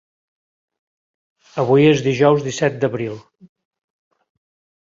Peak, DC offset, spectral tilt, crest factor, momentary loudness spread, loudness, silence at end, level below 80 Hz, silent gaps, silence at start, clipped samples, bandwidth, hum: -2 dBFS; under 0.1%; -6 dB/octave; 18 dB; 16 LU; -17 LUFS; 1.7 s; -58 dBFS; none; 1.55 s; under 0.1%; 7.6 kHz; none